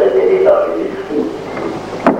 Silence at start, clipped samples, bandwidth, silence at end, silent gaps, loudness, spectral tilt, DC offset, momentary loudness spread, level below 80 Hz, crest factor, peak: 0 s; under 0.1%; 9.2 kHz; 0 s; none; -15 LUFS; -7 dB/octave; under 0.1%; 11 LU; -48 dBFS; 14 dB; 0 dBFS